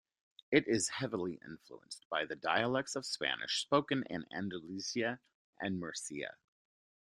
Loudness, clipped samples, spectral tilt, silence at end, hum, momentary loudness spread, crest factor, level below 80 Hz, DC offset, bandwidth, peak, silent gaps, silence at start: -36 LUFS; under 0.1%; -3.5 dB/octave; 0.8 s; none; 14 LU; 24 dB; -76 dBFS; under 0.1%; 13.5 kHz; -12 dBFS; 2.05-2.10 s, 5.34-5.53 s; 0.5 s